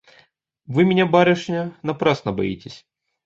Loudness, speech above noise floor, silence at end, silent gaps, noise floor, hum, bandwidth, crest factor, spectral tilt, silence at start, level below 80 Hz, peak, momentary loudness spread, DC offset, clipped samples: -20 LUFS; 39 dB; 0.5 s; none; -58 dBFS; none; 7.6 kHz; 20 dB; -7 dB/octave; 0.7 s; -54 dBFS; -2 dBFS; 12 LU; under 0.1%; under 0.1%